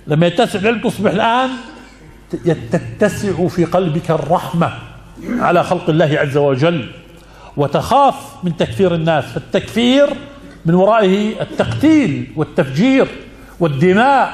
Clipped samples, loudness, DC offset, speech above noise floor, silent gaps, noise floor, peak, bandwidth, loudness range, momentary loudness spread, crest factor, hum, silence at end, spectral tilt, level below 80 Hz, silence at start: under 0.1%; -15 LUFS; under 0.1%; 25 dB; none; -39 dBFS; 0 dBFS; 14 kHz; 3 LU; 11 LU; 14 dB; none; 0 s; -6.5 dB/octave; -44 dBFS; 0.05 s